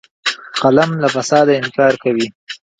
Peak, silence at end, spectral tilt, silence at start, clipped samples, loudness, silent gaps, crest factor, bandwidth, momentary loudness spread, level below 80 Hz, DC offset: 0 dBFS; 0.25 s; -4.5 dB/octave; 0.25 s; under 0.1%; -15 LUFS; 2.35-2.47 s; 16 dB; 9.4 kHz; 8 LU; -58 dBFS; under 0.1%